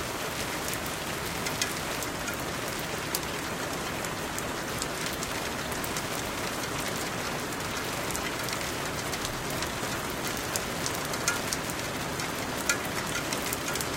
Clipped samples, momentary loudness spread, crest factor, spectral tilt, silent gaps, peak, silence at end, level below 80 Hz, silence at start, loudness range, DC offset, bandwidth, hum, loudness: under 0.1%; 3 LU; 28 dB; -2.5 dB/octave; none; -4 dBFS; 0 s; -50 dBFS; 0 s; 2 LU; under 0.1%; 17 kHz; none; -31 LUFS